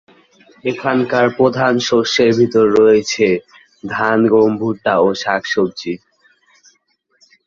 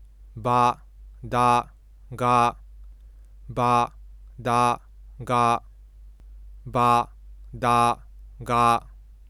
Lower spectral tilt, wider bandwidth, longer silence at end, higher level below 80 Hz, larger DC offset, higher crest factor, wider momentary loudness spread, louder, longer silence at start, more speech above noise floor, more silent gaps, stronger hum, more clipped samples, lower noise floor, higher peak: about the same, -5 dB/octave vs -5.5 dB/octave; second, 7.4 kHz vs 16 kHz; first, 1.5 s vs 0.3 s; second, -56 dBFS vs -46 dBFS; neither; about the same, 14 dB vs 18 dB; second, 12 LU vs 18 LU; first, -15 LUFS vs -23 LUFS; first, 0.65 s vs 0.35 s; first, 48 dB vs 25 dB; neither; neither; neither; first, -62 dBFS vs -46 dBFS; first, -2 dBFS vs -6 dBFS